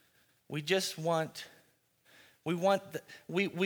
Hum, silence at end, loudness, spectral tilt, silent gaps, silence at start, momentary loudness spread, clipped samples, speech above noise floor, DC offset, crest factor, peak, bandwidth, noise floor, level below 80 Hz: none; 0 s; -34 LUFS; -4.5 dB/octave; none; 0.5 s; 14 LU; under 0.1%; 36 dB; under 0.1%; 22 dB; -14 dBFS; over 20 kHz; -69 dBFS; -82 dBFS